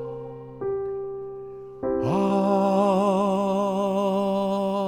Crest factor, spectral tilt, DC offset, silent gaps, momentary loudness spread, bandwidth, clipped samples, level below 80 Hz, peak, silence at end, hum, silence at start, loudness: 14 dB; -7.5 dB/octave; under 0.1%; none; 16 LU; 16 kHz; under 0.1%; -56 dBFS; -10 dBFS; 0 s; none; 0 s; -24 LUFS